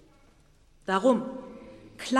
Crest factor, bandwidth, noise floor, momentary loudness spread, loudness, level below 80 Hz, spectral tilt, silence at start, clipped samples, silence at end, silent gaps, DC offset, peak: 20 dB; 13 kHz; -59 dBFS; 23 LU; -27 LUFS; -62 dBFS; -5 dB/octave; 0.9 s; under 0.1%; 0 s; none; under 0.1%; -10 dBFS